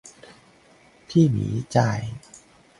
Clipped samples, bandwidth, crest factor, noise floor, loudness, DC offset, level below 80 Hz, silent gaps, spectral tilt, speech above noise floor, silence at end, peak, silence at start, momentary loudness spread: under 0.1%; 11.5 kHz; 20 dB; -55 dBFS; -22 LUFS; under 0.1%; -52 dBFS; none; -7 dB/octave; 33 dB; 0.45 s; -4 dBFS; 1.1 s; 15 LU